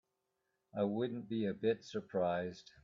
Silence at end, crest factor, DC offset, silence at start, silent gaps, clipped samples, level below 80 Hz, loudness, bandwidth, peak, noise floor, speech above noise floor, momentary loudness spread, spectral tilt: 0.25 s; 18 dB; under 0.1%; 0.75 s; none; under 0.1%; -78 dBFS; -38 LUFS; 7.4 kHz; -22 dBFS; -85 dBFS; 48 dB; 5 LU; -7 dB/octave